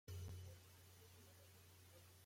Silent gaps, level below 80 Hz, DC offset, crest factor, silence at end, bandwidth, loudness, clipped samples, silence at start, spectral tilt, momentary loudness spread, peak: none; -76 dBFS; under 0.1%; 14 dB; 0 s; 16.5 kHz; -61 LUFS; under 0.1%; 0.05 s; -4.5 dB/octave; 11 LU; -44 dBFS